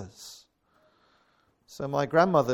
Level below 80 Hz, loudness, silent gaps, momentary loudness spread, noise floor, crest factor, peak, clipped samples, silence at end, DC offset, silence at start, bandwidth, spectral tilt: -66 dBFS; -26 LUFS; none; 23 LU; -68 dBFS; 22 dB; -8 dBFS; under 0.1%; 0 s; under 0.1%; 0 s; 17.5 kHz; -6 dB/octave